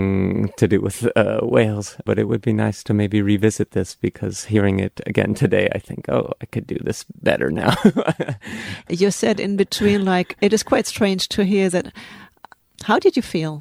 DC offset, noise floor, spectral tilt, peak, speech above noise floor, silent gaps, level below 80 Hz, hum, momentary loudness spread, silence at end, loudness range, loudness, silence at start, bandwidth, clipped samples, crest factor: under 0.1%; -48 dBFS; -5.5 dB/octave; 0 dBFS; 29 dB; none; -50 dBFS; none; 10 LU; 0 s; 2 LU; -20 LUFS; 0 s; 15.5 kHz; under 0.1%; 18 dB